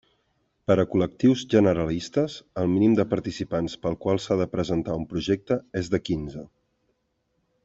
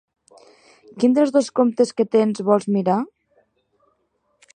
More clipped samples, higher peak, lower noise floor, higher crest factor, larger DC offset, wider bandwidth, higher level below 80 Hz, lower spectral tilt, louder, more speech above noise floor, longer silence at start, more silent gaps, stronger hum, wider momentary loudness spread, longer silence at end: neither; second, -6 dBFS vs -2 dBFS; first, -73 dBFS vs -68 dBFS; about the same, 20 dB vs 18 dB; neither; second, 8 kHz vs 9.6 kHz; first, -52 dBFS vs -74 dBFS; about the same, -7 dB/octave vs -6.5 dB/octave; second, -25 LUFS vs -19 LUFS; about the same, 50 dB vs 50 dB; second, 0.7 s vs 0.95 s; neither; neither; first, 9 LU vs 4 LU; second, 1.2 s vs 1.5 s